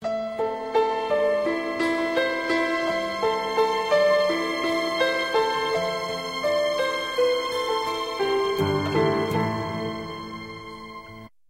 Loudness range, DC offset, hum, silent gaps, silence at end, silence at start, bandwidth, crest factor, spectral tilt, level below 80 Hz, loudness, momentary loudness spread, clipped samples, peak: 3 LU; under 0.1%; none; none; 0.25 s; 0 s; 16 kHz; 16 dB; -4.5 dB/octave; -56 dBFS; -24 LUFS; 11 LU; under 0.1%; -8 dBFS